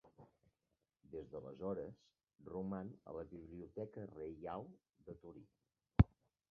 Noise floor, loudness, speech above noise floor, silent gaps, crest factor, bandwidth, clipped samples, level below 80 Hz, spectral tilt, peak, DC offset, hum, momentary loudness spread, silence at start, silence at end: -89 dBFS; -44 LUFS; 40 dB; none; 30 dB; 5 kHz; under 0.1%; -52 dBFS; -9 dB/octave; -14 dBFS; under 0.1%; none; 23 LU; 0.05 s; 0.45 s